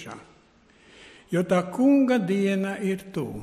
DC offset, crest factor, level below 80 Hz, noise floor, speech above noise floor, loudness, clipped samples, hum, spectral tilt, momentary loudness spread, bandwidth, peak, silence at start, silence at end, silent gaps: under 0.1%; 14 dB; -62 dBFS; -57 dBFS; 34 dB; -24 LUFS; under 0.1%; none; -7 dB/octave; 12 LU; 14 kHz; -10 dBFS; 0 s; 0 s; none